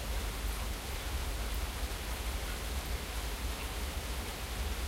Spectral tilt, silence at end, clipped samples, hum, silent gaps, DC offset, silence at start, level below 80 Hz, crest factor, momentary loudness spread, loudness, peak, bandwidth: -3.5 dB/octave; 0 s; under 0.1%; none; none; under 0.1%; 0 s; -38 dBFS; 12 dB; 1 LU; -38 LUFS; -24 dBFS; 16 kHz